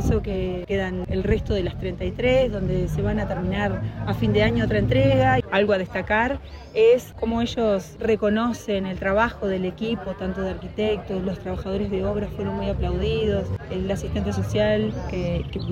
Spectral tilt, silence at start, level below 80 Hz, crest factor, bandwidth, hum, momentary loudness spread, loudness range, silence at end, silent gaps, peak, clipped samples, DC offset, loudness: -7 dB/octave; 0 s; -36 dBFS; 16 dB; 15.5 kHz; none; 9 LU; 5 LU; 0 s; none; -8 dBFS; under 0.1%; under 0.1%; -24 LUFS